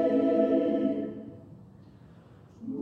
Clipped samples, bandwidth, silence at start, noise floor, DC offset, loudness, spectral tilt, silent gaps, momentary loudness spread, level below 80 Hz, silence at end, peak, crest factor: under 0.1%; 4.5 kHz; 0 s; -53 dBFS; under 0.1%; -27 LUFS; -9 dB/octave; none; 21 LU; -66 dBFS; 0 s; -12 dBFS; 18 dB